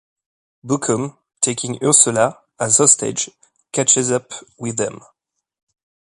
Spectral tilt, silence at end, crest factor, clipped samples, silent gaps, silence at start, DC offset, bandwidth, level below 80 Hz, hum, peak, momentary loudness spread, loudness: -3 dB/octave; 1.2 s; 20 dB; under 0.1%; none; 0.65 s; under 0.1%; 11.5 kHz; -62 dBFS; none; 0 dBFS; 14 LU; -16 LUFS